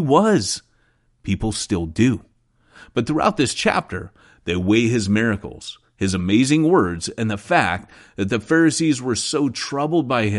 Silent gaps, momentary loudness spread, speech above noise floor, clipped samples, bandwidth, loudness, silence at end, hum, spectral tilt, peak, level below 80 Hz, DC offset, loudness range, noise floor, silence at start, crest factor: none; 13 LU; 42 dB; under 0.1%; 11.5 kHz; -20 LUFS; 0 s; none; -5 dB/octave; -2 dBFS; -46 dBFS; under 0.1%; 3 LU; -61 dBFS; 0 s; 18 dB